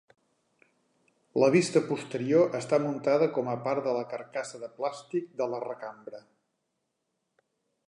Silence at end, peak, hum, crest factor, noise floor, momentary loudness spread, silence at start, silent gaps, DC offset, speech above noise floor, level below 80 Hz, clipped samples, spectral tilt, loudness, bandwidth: 1.7 s; -10 dBFS; none; 20 dB; -81 dBFS; 16 LU; 1.35 s; none; under 0.1%; 52 dB; -82 dBFS; under 0.1%; -6 dB/octave; -28 LUFS; 11 kHz